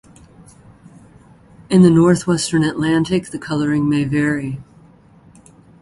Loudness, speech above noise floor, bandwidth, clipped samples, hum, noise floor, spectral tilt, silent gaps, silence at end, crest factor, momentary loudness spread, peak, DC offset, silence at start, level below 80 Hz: -16 LUFS; 32 dB; 11.5 kHz; under 0.1%; none; -47 dBFS; -6.5 dB/octave; none; 1.2 s; 18 dB; 12 LU; 0 dBFS; under 0.1%; 1.7 s; -50 dBFS